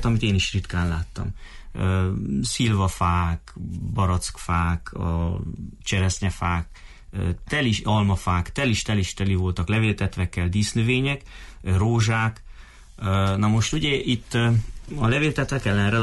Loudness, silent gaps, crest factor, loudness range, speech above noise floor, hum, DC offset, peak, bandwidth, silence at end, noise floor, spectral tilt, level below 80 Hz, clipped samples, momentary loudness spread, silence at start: -24 LUFS; none; 12 dB; 3 LU; 20 dB; none; under 0.1%; -10 dBFS; 11.5 kHz; 0 s; -43 dBFS; -5.5 dB/octave; -36 dBFS; under 0.1%; 10 LU; 0 s